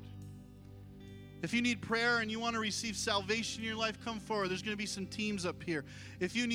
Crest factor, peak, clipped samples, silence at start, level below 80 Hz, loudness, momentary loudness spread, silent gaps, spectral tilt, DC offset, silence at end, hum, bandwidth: 20 dB; -18 dBFS; under 0.1%; 0 s; -62 dBFS; -35 LUFS; 19 LU; none; -3.5 dB/octave; under 0.1%; 0 s; 60 Hz at -65 dBFS; 16 kHz